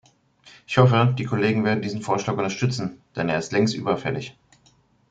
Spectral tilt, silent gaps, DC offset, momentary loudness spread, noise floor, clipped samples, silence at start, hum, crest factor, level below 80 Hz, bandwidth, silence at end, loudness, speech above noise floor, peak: -6.5 dB/octave; none; under 0.1%; 12 LU; -60 dBFS; under 0.1%; 0.45 s; none; 20 dB; -58 dBFS; 7.8 kHz; 0.8 s; -23 LUFS; 38 dB; -2 dBFS